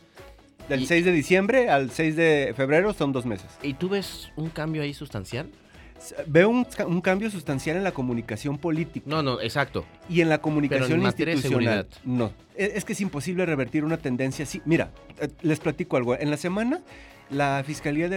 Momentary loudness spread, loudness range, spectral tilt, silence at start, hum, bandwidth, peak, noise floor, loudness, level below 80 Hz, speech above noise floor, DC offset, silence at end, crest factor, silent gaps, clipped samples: 12 LU; 5 LU; -6 dB/octave; 0.15 s; none; 18 kHz; -4 dBFS; -49 dBFS; -25 LUFS; -52 dBFS; 24 dB; under 0.1%; 0 s; 20 dB; none; under 0.1%